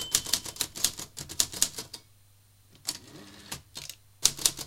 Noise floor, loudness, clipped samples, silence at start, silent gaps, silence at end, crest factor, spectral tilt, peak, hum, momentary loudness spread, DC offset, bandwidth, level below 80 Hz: -60 dBFS; -29 LUFS; under 0.1%; 0 s; none; 0 s; 34 dB; 0.5 dB/octave; 0 dBFS; none; 18 LU; under 0.1%; 17 kHz; -56 dBFS